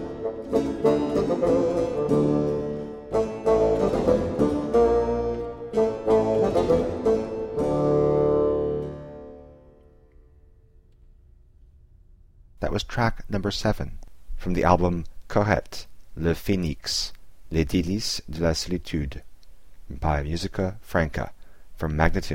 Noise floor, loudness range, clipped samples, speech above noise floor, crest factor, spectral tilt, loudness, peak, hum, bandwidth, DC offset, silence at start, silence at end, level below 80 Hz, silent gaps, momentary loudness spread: -54 dBFS; 7 LU; under 0.1%; 29 dB; 20 dB; -6 dB/octave; -25 LUFS; -4 dBFS; none; 16.5 kHz; under 0.1%; 0 s; 0 s; -38 dBFS; none; 12 LU